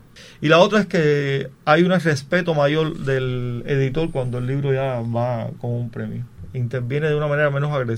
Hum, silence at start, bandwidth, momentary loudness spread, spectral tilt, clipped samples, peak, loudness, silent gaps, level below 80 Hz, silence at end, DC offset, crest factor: none; 0.15 s; 11 kHz; 11 LU; -7 dB/octave; under 0.1%; 0 dBFS; -20 LUFS; none; -44 dBFS; 0 s; under 0.1%; 20 dB